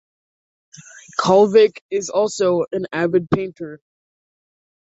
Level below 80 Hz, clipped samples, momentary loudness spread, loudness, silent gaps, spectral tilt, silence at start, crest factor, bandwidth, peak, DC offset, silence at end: -56 dBFS; under 0.1%; 15 LU; -18 LUFS; 1.81-1.89 s; -5.5 dB/octave; 1.2 s; 18 dB; 8 kHz; -2 dBFS; under 0.1%; 1.1 s